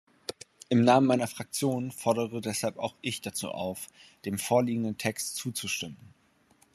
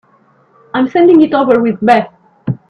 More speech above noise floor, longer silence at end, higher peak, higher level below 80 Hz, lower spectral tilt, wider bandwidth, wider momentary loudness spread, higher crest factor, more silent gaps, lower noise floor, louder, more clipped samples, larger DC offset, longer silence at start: second, 36 dB vs 41 dB; first, 0.8 s vs 0.15 s; second, -8 dBFS vs 0 dBFS; second, -72 dBFS vs -54 dBFS; second, -4.5 dB/octave vs -8 dB/octave; first, 13.5 kHz vs 6.6 kHz; first, 18 LU vs 15 LU; first, 22 dB vs 12 dB; neither; first, -65 dBFS vs -50 dBFS; second, -29 LUFS vs -10 LUFS; neither; neither; second, 0.3 s vs 0.75 s